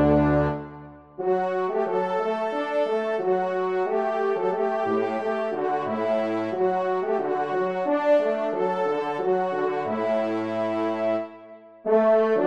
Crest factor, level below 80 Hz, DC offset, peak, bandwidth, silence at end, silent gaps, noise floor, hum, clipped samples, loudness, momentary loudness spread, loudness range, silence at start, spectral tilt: 16 dB; -50 dBFS; 0.1%; -8 dBFS; 8.4 kHz; 0 s; none; -46 dBFS; none; under 0.1%; -25 LUFS; 6 LU; 1 LU; 0 s; -8 dB/octave